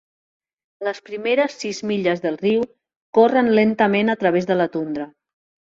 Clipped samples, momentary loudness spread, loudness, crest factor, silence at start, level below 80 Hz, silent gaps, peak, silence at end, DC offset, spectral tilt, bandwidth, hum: under 0.1%; 12 LU; -20 LUFS; 18 dB; 0.8 s; -64 dBFS; 2.96-3.13 s; -4 dBFS; 0.65 s; under 0.1%; -6 dB/octave; 7.8 kHz; none